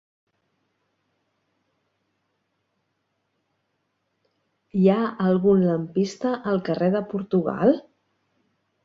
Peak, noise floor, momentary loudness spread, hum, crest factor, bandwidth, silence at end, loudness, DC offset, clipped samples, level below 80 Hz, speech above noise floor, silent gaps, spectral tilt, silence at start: -6 dBFS; -75 dBFS; 7 LU; none; 20 dB; 7.6 kHz; 1.05 s; -22 LUFS; under 0.1%; under 0.1%; -64 dBFS; 53 dB; none; -8 dB/octave; 4.75 s